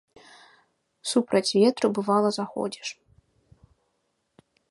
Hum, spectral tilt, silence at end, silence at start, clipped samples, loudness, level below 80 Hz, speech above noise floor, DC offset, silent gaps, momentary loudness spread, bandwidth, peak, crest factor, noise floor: none; -4.5 dB/octave; 1.8 s; 1.05 s; under 0.1%; -25 LUFS; -70 dBFS; 51 dB; under 0.1%; none; 14 LU; 11.5 kHz; -8 dBFS; 20 dB; -75 dBFS